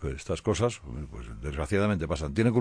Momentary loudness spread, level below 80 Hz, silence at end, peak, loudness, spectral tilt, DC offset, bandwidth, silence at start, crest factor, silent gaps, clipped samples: 13 LU; -42 dBFS; 0 s; -10 dBFS; -29 LUFS; -6.5 dB/octave; under 0.1%; 10.5 kHz; 0 s; 18 dB; none; under 0.1%